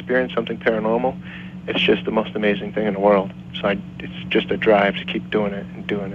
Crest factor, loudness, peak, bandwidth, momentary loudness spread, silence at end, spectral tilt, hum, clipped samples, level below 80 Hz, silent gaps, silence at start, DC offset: 18 dB; -21 LUFS; -4 dBFS; 7.4 kHz; 12 LU; 0 s; -7.5 dB/octave; none; under 0.1%; -50 dBFS; none; 0 s; under 0.1%